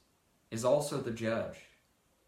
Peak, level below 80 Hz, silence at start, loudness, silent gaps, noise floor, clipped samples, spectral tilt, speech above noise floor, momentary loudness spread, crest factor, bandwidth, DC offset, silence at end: -16 dBFS; -68 dBFS; 0.5 s; -34 LUFS; none; -72 dBFS; under 0.1%; -5 dB/octave; 39 dB; 13 LU; 20 dB; 16 kHz; under 0.1%; 0.65 s